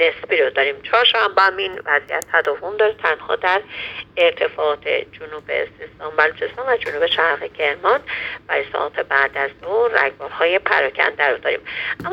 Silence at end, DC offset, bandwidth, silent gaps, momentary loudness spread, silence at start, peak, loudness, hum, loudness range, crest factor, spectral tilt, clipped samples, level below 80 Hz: 0 s; under 0.1%; 14 kHz; none; 9 LU; 0 s; 0 dBFS; -19 LUFS; none; 3 LU; 20 dB; -3 dB/octave; under 0.1%; -56 dBFS